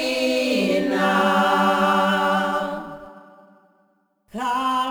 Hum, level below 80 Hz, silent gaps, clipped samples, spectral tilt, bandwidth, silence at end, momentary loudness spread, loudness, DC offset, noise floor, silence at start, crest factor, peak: none; -58 dBFS; none; under 0.1%; -4.5 dB/octave; over 20 kHz; 0 s; 13 LU; -20 LUFS; under 0.1%; -64 dBFS; 0 s; 16 dB; -6 dBFS